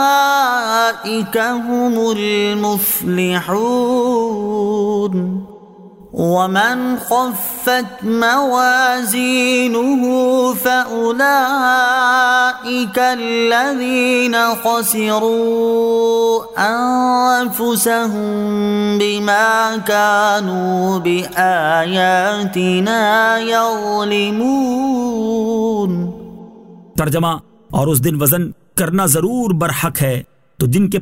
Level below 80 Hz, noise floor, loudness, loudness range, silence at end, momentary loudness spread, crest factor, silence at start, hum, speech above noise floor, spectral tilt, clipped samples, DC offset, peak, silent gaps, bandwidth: -50 dBFS; -39 dBFS; -15 LUFS; 4 LU; 0 s; 6 LU; 16 dB; 0 s; none; 24 dB; -4.5 dB/octave; under 0.1%; under 0.1%; 0 dBFS; none; 16.5 kHz